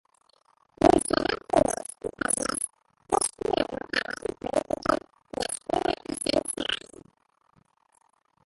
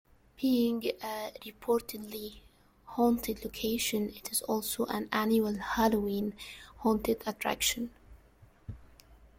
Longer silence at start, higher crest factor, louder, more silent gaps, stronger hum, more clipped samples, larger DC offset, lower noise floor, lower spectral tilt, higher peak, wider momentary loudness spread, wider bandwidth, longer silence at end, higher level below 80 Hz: first, 0.8 s vs 0.4 s; first, 24 dB vs 18 dB; first, -27 LUFS vs -32 LUFS; neither; neither; neither; neither; first, -67 dBFS vs -60 dBFS; about the same, -3 dB/octave vs -3.5 dB/octave; first, -6 dBFS vs -14 dBFS; second, 10 LU vs 14 LU; second, 12 kHz vs 16.5 kHz; first, 1.7 s vs 0.25 s; about the same, -52 dBFS vs -56 dBFS